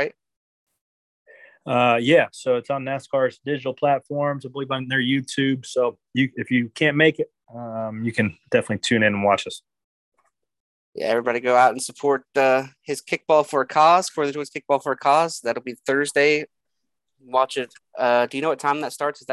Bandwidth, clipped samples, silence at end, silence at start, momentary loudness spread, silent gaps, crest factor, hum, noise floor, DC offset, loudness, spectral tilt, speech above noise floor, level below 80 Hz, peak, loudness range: 12.5 kHz; under 0.1%; 0 s; 0 s; 12 LU; 0.36-0.67 s, 0.81-1.26 s, 9.84-10.12 s, 10.60-10.93 s; 20 dB; none; -82 dBFS; under 0.1%; -21 LUFS; -4.5 dB/octave; 60 dB; -64 dBFS; -2 dBFS; 4 LU